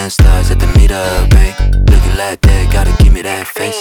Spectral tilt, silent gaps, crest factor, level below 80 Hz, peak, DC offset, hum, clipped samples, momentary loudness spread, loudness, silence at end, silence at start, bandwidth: -5.5 dB/octave; none; 8 dB; -10 dBFS; 0 dBFS; under 0.1%; none; under 0.1%; 6 LU; -11 LUFS; 0 s; 0 s; 17 kHz